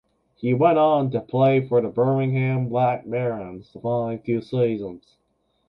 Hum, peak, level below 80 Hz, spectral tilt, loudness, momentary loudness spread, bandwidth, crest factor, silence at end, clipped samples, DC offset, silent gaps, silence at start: none; -6 dBFS; -60 dBFS; -10.5 dB/octave; -22 LUFS; 12 LU; 5.4 kHz; 16 dB; 0.7 s; under 0.1%; under 0.1%; none; 0.4 s